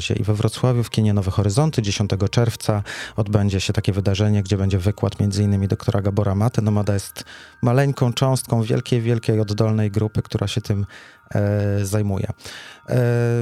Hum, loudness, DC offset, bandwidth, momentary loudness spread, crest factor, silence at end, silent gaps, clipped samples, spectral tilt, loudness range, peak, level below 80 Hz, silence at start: none; -21 LUFS; under 0.1%; 14 kHz; 7 LU; 18 dB; 0 s; none; under 0.1%; -6.5 dB/octave; 2 LU; -2 dBFS; -46 dBFS; 0 s